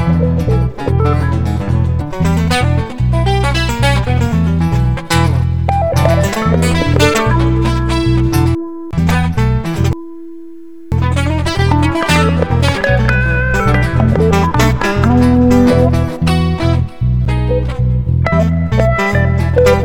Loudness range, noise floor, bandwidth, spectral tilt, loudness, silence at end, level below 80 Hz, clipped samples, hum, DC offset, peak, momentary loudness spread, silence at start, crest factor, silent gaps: 4 LU; -33 dBFS; 17 kHz; -6.5 dB/octave; -13 LUFS; 0 s; -20 dBFS; under 0.1%; none; 3%; 0 dBFS; 5 LU; 0 s; 12 dB; none